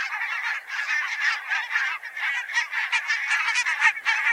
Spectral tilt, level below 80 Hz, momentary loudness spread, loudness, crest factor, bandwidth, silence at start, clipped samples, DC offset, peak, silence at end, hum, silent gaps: 5 dB/octave; -82 dBFS; 7 LU; -23 LUFS; 20 dB; 16 kHz; 0 s; under 0.1%; under 0.1%; -6 dBFS; 0 s; none; none